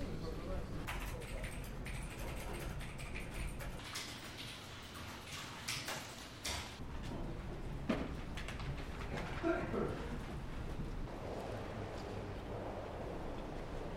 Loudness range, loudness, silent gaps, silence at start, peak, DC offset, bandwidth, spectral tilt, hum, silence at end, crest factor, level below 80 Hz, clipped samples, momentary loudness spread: 4 LU; -44 LUFS; none; 0 s; -22 dBFS; under 0.1%; 16 kHz; -4.5 dB/octave; none; 0 s; 20 dB; -48 dBFS; under 0.1%; 6 LU